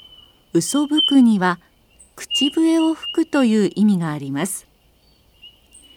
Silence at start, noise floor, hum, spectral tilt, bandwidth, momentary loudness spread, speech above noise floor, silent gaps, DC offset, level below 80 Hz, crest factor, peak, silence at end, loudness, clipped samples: 0.55 s; -56 dBFS; none; -4.5 dB/octave; 17.5 kHz; 11 LU; 39 dB; none; under 0.1%; -60 dBFS; 16 dB; -4 dBFS; 0.5 s; -18 LUFS; under 0.1%